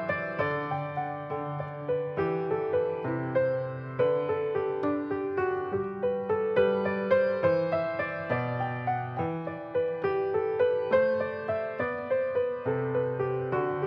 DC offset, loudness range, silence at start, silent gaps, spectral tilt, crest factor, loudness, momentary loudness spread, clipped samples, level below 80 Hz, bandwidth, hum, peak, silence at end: under 0.1%; 3 LU; 0 s; none; -9.5 dB/octave; 16 dB; -29 LUFS; 7 LU; under 0.1%; -66 dBFS; 5.4 kHz; none; -12 dBFS; 0 s